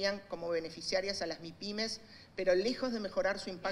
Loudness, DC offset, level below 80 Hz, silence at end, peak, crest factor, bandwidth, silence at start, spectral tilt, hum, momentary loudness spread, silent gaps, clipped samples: -36 LUFS; under 0.1%; -62 dBFS; 0 s; -18 dBFS; 18 dB; 12.5 kHz; 0 s; -3.5 dB/octave; none; 9 LU; none; under 0.1%